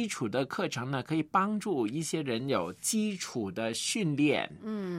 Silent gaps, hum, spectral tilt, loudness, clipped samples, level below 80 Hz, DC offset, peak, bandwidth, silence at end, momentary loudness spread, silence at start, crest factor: none; none; -4.5 dB/octave; -31 LUFS; under 0.1%; -74 dBFS; under 0.1%; -12 dBFS; 16 kHz; 0 s; 6 LU; 0 s; 18 dB